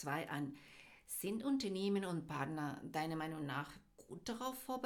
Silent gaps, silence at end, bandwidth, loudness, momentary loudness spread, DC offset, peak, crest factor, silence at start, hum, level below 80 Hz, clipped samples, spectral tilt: none; 0 s; 19 kHz; -42 LUFS; 16 LU; under 0.1%; -26 dBFS; 18 dB; 0 s; none; -74 dBFS; under 0.1%; -5 dB/octave